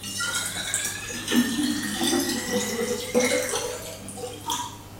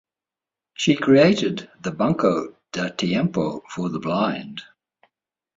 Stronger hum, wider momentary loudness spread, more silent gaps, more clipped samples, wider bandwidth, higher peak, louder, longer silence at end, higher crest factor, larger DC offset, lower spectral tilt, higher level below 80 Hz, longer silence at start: neither; second, 10 LU vs 16 LU; neither; neither; first, 17 kHz vs 7.8 kHz; second, -8 dBFS vs -4 dBFS; second, -26 LUFS vs -22 LUFS; second, 0 s vs 0.95 s; about the same, 18 dB vs 18 dB; neither; second, -2.5 dB/octave vs -6 dB/octave; first, -54 dBFS vs -60 dBFS; second, 0 s vs 0.8 s